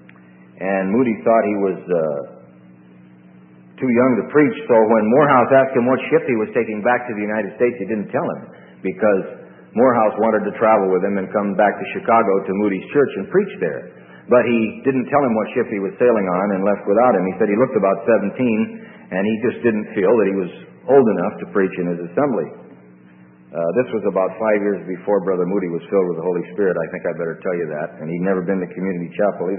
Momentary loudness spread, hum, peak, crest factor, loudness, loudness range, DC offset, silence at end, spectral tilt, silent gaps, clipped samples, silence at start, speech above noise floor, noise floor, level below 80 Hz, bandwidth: 10 LU; none; 0 dBFS; 18 dB; -18 LUFS; 6 LU; under 0.1%; 0 s; -12.5 dB/octave; none; under 0.1%; 0.6 s; 28 dB; -46 dBFS; -64 dBFS; 3.6 kHz